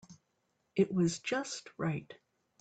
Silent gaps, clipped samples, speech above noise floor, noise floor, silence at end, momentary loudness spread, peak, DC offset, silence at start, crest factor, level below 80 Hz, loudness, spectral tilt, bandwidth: none; under 0.1%; 46 dB; -79 dBFS; 0.45 s; 10 LU; -16 dBFS; under 0.1%; 0.1 s; 20 dB; -72 dBFS; -34 LUFS; -5.5 dB/octave; 9.2 kHz